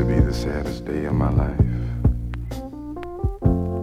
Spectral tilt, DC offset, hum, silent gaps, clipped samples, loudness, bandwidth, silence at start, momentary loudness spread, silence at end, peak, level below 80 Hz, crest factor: -8.5 dB/octave; under 0.1%; none; none; under 0.1%; -24 LUFS; 13 kHz; 0 s; 12 LU; 0 s; -4 dBFS; -28 dBFS; 18 dB